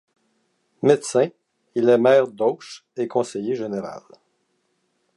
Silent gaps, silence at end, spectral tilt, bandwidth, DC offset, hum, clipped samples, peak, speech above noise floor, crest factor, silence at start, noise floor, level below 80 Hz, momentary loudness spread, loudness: none; 1.2 s; -5.5 dB/octave; 11.5 kHz; under 0.1%; none; under 0.1%; -2 dBFS; 50 dB; 20 dB; 0.85 s; -70 dBFS; -74 dBFS; 17 LU; -21 LUFS